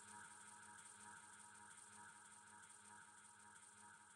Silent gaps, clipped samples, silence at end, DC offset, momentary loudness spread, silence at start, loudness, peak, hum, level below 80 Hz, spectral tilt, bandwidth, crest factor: none; under 0.1%; 0 s; under 0.1%; 4 LU; 0 s; -61 LUFS; -46 dBFS; none; under -90 dBFS; -1 dB/octave; 12.5 kHz; 16 dB